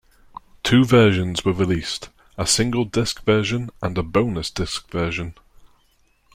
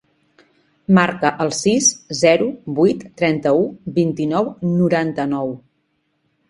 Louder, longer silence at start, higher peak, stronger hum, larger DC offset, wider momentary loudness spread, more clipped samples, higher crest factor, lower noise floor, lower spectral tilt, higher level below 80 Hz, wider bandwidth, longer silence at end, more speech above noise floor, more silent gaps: about the same, -20 LUFS vs -18 LUFS; second, 0.65 s vs 0.9 s; second, -4 dBFS vs 0 dBFS; neither; neither; first, 12 LU vs 7 LU; neither; about the same, 18 dB vs 18 dB; second, -61 dBFS vs -68 dBFS; about the same, -5 dB/octave vs -4.5 dB/octave; first, -42 dBFS vs -58 dBFS; first, 15.5 kHz vs 11.5 kHz; second, 0.7 s vs 0.9 s; second, 41 dB vs 50 dB; neither